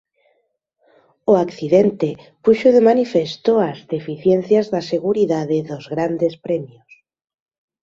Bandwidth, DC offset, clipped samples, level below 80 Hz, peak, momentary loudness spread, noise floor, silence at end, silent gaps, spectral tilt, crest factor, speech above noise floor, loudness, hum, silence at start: 7.6 kHz; under 0.1%; under 0.1%; -60 dBFS; -2 dBFS; 11 LU; -68 dBFS; 1.15 s; none; -7.5 dB/octave; 18 dB; 51 dB; -18 LUFS; none; 1.25 s